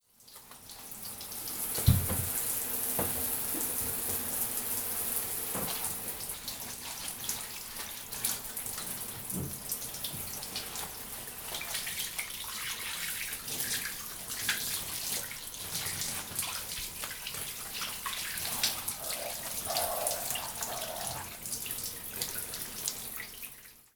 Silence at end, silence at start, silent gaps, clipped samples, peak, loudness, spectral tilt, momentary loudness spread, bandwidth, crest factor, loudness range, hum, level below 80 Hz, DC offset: 0.1 s; 0.2 s; none; under 0.1%; -8 dBFS; -33 LUFS; -2 dB/octave; 8 LU; over 20 kHz; 28 dB; 5 LU; none; -54 dBFS; under 0.1%